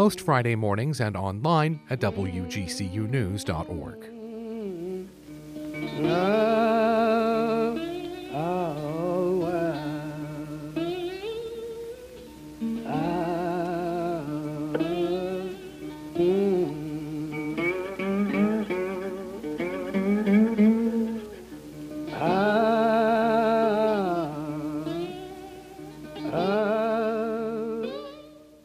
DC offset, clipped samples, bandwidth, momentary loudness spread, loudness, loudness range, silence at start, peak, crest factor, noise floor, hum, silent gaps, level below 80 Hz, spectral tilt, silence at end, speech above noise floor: under 0.1%; under 0.1%; 15.5 kHz; 17 LU; -27 LUFS; 7 LU; 0 s; -10 dBFS; 18 dB; -48 dBFS; none; none; -56 dBFS; -7 dB/octave; 0.2 s; 22 dB